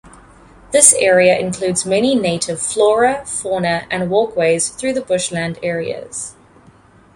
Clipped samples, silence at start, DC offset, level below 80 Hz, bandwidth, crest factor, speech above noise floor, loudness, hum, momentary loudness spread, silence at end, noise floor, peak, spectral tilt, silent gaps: under 0.1%; 0.05 s; under 0.1%; -50 dBFS; 16 kHz; 16 dB; 31 dB; -15 LUFS; none; 13 LU; 0.85 s; -47 dBFS; 0 dBFS; -3 dB/octave; none